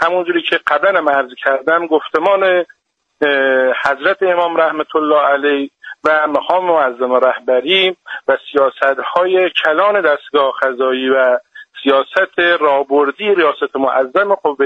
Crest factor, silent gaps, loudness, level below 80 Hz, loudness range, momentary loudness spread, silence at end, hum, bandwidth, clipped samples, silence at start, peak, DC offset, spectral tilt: 14 dB; none; -14 LUFS; -64 dBFS; 1 LU; 4 LU; 0 s; none; 7.8 kHz; under 0.1%; 0 s; 0 dBFS; under 0.1%; -5 dB/octave